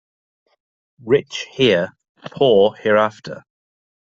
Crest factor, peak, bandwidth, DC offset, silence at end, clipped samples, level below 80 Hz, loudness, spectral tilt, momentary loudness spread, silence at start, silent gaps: 18 dB; -2 dBFS; 7.6 kHz; under 0.1%; 0.8 s; under 0.1%; -58 dBFS; -17 LUFS; -5.5 dB/octave; 23 LU; 1.05 s; 2.09-2.15 s